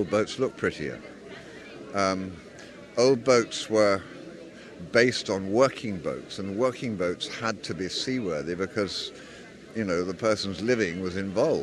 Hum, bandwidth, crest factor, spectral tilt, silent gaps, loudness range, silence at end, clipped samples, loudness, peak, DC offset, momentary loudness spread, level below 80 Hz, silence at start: none; 12 kHz; 22 dB; -4.5 dB/octave; none; 5 LU; 0 s; under 0.1%; -27 LUFS; -6 dBFS; under 0.1%; 20 LU; -60 dBFS; 0 s